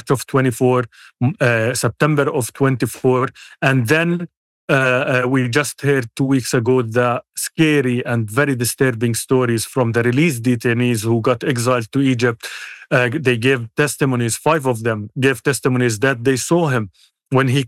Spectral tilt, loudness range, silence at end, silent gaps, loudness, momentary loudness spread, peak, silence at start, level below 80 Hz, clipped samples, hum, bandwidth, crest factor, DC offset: -5.5 dB/octave; 1 LU; 0 s; 4.37-4.68 s; -17 LUFS; 5 LU; -4 dBFS; 0.05 s; -60 dBFS; under 0.1%; none; 16 kHz; 14 dB; under 0.1%